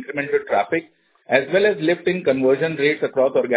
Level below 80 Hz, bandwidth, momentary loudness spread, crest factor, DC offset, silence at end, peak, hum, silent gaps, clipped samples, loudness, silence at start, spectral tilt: -62 dBFS; 4 kHz; 5 LU; 18 dB; under 0.1%; 0 s; 0 dBFS; none; none; under 0.1%; -20 LUFS; 0 s; -9.5 dB/octave